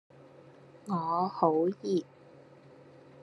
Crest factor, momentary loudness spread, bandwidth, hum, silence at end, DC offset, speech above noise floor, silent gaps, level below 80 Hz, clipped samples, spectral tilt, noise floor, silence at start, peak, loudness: 22 dB; 16 LU; 11 kHz; none; 1.2 s; under 0.1%; 26 dB; none; -82 dBFS; under 0.1%; -8 dB/octave; -55 dBFS; 0.75 s; -12 dBFS; -30 LUFS